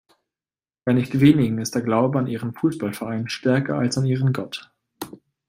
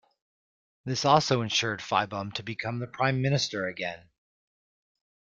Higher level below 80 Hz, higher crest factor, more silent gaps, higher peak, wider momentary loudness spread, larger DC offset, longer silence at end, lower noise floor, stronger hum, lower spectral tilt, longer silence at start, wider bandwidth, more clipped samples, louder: first, -58 dBFS vs -64 dBFS; about the same, 20 dB vs 24 dB; neither; first, -2 dBFS vs -6 dBFS; first, 18 LU vs 12 LU; neither; second, 0.4 s vs 1.4 s; about the same, under -90 dBFS vs under -90 dBFS; neither; first, -6.5 dB/octave vs -4.5 dB/octave; about the same, 0.85 s vs 0.85 s; first, 16 kHz vs 7.8 kHz; neither; first, -21 LUFS vs -28 LUFS